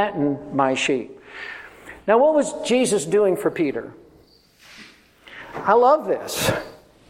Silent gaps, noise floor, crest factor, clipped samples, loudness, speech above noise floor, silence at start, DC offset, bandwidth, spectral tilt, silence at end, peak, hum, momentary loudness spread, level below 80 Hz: none; -54 dBFS; 18 dB; under 0.1%; -20 LUFS; 34 dB; 0 s; under 0.1%; 16.5 kHz; -4 dB/octave; 0.35 s; -4 dBFS; none; 20 LU; -58 dBFS